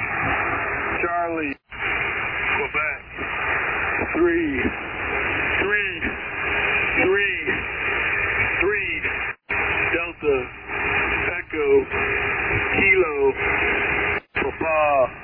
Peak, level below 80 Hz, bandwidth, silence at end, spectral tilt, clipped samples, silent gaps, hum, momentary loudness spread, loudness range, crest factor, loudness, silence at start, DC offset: -6 dBFS; -42 dBFS; 3.4 kHz; 0 s; -8.5 dB/octave; under 0.1%; none; none; 7 LU; 3 LU; 16 dB; -21 LUFS; 0 s; under 0.1%